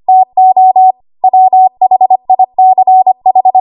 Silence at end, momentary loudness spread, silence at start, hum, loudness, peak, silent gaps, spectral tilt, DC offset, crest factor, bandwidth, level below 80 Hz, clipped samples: 0 s; 4 LU; 0.1 s; none; -7 LUFS; 0 dBFS; none; -10 dB/octave; under 0.1%; 6 dB; 1.1 kHz; -64 dBFS; under 0.1%